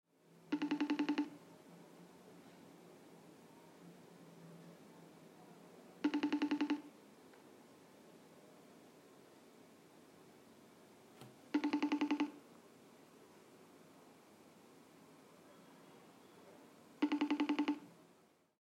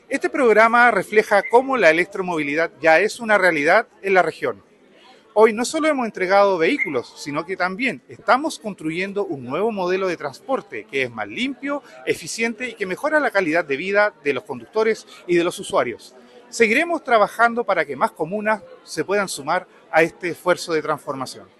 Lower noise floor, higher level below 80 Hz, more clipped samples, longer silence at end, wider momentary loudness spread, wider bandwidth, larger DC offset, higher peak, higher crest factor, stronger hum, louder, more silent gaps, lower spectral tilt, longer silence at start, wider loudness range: first, -70 dBFS vs -50 dBFS; second, under -90 dBFS vs -64 dBFS; neither; first, 0.7 s vs 0.15 s; first, 25 LU vs 11 LU; about the same, 13.5 kHz vs 12.5 kHz; neither; second, -24 dBFS vs -2 dBFS; about the same, 20 dB vs 20 dB; neither; second, -39 LUFS vs -20 LUFS; neither; about the same, -5 dB/octave vs -4 dB/octave; first, 0.45 s vs 0.1 s; first, 19 LU vs 7 LU